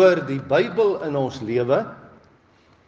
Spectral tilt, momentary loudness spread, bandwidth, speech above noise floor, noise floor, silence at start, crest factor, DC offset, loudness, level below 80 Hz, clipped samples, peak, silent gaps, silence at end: -7 dB/octave; 7 LU; 7.4 kHz; 36 dB; -56 dBFS; 0 s; 18 dB; under 0.1%; -22 LUFS; -64 dBFS; under 0.1%; -4 dBFS; none; 0.9 s